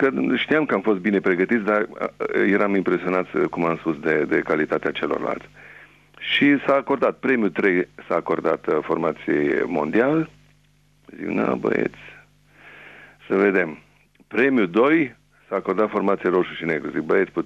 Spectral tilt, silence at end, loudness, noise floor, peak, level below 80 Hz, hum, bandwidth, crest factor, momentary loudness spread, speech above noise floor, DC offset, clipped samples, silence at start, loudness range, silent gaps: -7.5 dB/octave; 0 s; -21 LUFS; -59 dBFS; -6 dBFS; -60 dBFS; 50 Hz at -55 dBFS; 7.8 kHz; 16 dB; 7 LU; 38 dB; under 0.1%; under 0.1%; 0 s; 4 LU; none